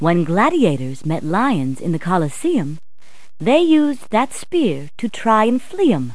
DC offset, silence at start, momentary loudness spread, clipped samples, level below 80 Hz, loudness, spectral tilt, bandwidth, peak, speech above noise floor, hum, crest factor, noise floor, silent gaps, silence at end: 4%; 0 s; 9 LU; under 0.1%; -56 dBFS; -18 LUFS; -6.5 dB/octave; 11 kHz; -2 dBFS; 36 dB; none; 16 dB; -53 dBFS; none; 0 s